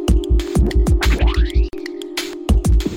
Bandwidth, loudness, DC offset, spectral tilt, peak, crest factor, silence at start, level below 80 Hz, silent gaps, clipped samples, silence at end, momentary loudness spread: 16 kHz; -19 LUFS; under 0.1%; -6 dB/octave; -2 dBFS; 14 dB; 0 s; -16 dBFS; none; under 0.1%; 0 s; 9 LU